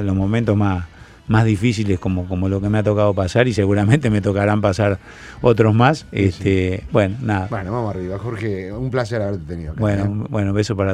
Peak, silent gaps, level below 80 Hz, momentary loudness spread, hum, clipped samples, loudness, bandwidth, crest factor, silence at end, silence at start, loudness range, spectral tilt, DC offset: 0 dBFS; none; -40 dBFS; 9 LU; none; under 0.1%; -19 LUFS; 10 kHz; 18 dB; 0 s; 0 s; 5 LU; -7.5 dB/octave; under 0.1%